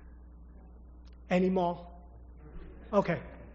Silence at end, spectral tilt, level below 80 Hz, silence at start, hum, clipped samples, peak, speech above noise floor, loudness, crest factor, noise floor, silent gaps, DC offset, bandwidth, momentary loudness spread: 0 s; -6.5 dB/octave; -50 dBFS; 0.05 s; none; under 0.1%; -12 dBFS; 22 dB; -31 LUFS; 22 dB; -51 dBFS; none; under 0.1%; 7 kHz; 25 LU